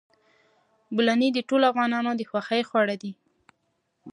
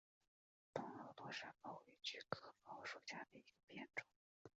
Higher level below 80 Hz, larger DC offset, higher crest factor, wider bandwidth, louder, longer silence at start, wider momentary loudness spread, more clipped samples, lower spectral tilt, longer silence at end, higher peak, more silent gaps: first, -78 dBFS vs -88 dBFS; neither; second, 20 dB vs 30 dB; first, 10.5 kHz vs 7.6 kHz; first, -24 LUFS vs -53 LUFS; first, 0.9 s vs 0.75 s; about the same, 9 LU vs 9 LU; neither; first, -5 dB/octave vs -1.5 dB/octave; about the same, 0 s vs 0.1 s; first, -8 dBFS vs -26 dBFS; second, none vs 3.64-3.68 s, 4.16-4.45 s